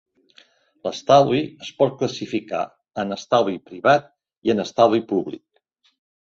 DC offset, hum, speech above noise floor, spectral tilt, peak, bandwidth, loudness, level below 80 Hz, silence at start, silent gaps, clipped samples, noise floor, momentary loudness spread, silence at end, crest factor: under 0.1%; none; 45 dB; -5.5 dB/octave; -2 dBFS; 7.6 kHz; -21 LUFS; -62 dBFS; 0.85 s; 4.38-4.42 s; under 0.1%; -65 dBFS; 14 LU; 0.85 s; 20 dB